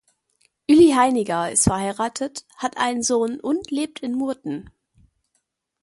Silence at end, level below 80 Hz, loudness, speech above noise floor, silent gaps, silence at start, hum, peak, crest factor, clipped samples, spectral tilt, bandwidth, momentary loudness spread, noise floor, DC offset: 1.2 s; -50 dBFS; -21 LUFS; 51 dB; none; 0.7 s; none; -4 dBFS; 18 dB; under 0.1%; -4 dB/octave; 11.5 kHz; 15 LU; -73 dBFS; under 0.1%